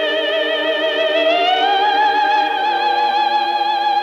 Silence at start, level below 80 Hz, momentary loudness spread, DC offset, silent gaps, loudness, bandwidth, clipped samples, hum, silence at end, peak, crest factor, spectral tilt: 0 s; -66 dBFS; 3 LU; under 0.1%; none; -16 LUFS; 7.6 kHz; under 0.1%; none; 0 s; -4 dBFS; 12 dB; -2 dB/octave